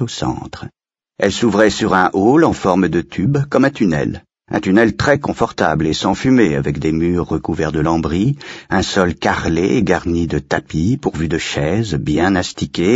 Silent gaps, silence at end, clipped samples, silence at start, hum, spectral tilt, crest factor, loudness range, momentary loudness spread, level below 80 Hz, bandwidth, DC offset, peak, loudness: none; 0 s; under 0.1%; 0 s; none; -6 dB/octave; 16 dB; 3 LU; 7 LU; -36 dBFS; 8 kHz; under 0.1%; 0 dBFS; -16 LUFS